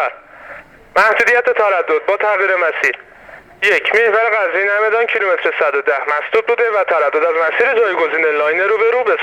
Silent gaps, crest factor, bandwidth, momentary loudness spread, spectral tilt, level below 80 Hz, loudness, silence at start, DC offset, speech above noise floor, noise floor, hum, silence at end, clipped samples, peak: none; 14 dB; 11 kHz; 5 LU; -2.5 dB/octave; -58 dBFS; -14 LUFS; 0 s; under 0.1%; 25 dB; -39 dBFS; none; 0 s; under 0.1%; 0 dBFS